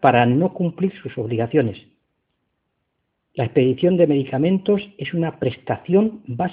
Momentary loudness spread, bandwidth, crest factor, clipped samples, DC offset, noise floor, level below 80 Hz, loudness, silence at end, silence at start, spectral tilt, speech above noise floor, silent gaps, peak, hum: 10 LU; 4.8 kHz; 20 dB; under 0.1%; under 0.1%; -74 dBFS; -58 dBFS; -20 LUFS; 0 s; 0 s; -11 dB/octave; 55 dB; none; 0 dBFS; none